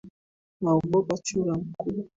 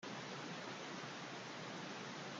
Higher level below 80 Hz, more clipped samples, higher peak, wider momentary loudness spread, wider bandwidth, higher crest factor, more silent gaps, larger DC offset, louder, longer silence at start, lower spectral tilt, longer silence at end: first, -58 dBFS vs -88 dBFS; neither; first, -12 dBFS vs -36 dBFS; first, 9 LU vs 1 LU; second, 8 kHz vs 10 kHz; about the same, 16 dB vs 12 dB; first, 0.10-0.60 s vs none; neither; first, -27 LUFS vs -48 LUFS; about the same, 0.05 s vs 0 s; first, -6.5 dB/octave vs -3.5 dB/octave; about the same, 0.1 s vs 0 s